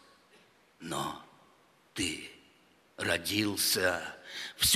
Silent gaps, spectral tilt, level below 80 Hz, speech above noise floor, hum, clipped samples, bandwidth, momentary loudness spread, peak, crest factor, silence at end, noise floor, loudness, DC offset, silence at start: none; -2 dB/octave; -60 dBFS; 33 dB; none; under 0.1%; 15.5 kHz; 17 LU; -12 dBFS; 22 dB; 0 s; -64 dBFS; -32 LUFS; under 0.1%; 0.8 s